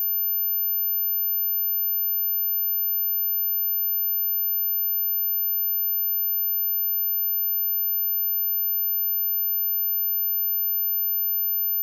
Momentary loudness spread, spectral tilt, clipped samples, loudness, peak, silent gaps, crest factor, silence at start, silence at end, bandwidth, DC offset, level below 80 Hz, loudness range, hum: 0 LU; 0 dB/octave; under 0.1%; -21 LUFS; -20 dBFS; none; 4 dB; 0 s; 0 s; 14 kHz; under 0.1%; under -90 dBFS; 0 LU; none